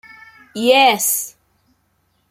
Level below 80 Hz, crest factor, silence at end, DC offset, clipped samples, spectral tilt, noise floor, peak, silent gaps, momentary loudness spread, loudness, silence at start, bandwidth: -66 dBFS; 18 dB; 1 s; under 0.1%; under 0.1%; -1 dB/octave; -64 dBFS; -2 dBFS; none; 19 LU; -14 LUFS; 0.55 s; 16 kHz